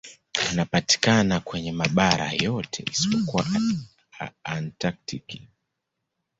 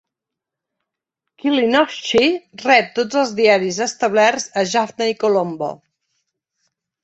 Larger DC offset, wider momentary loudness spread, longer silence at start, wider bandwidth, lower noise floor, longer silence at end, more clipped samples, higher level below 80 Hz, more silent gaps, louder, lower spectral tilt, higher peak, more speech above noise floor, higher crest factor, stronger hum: neither; first, 15 LU vs 8 LU; second, 0.05 s vs 1.45 s; about the same, 8.2 kHz vs 8.2 kHz; about the same, -81 dBFS vs -84 dBFS; second, 0.95 s vs 1.25 s; neither; first, -52 dBFS vs -62 dBFS; neither; second, -24 LUFS vs -17 LUFS; about the same, -4 dB/octave vs -3.5 dB/octave; about the same, 0 dBFS vs -2 dBFS; second, 57 dB vs 67 dB; first, 26 dB vs 18 dB; neither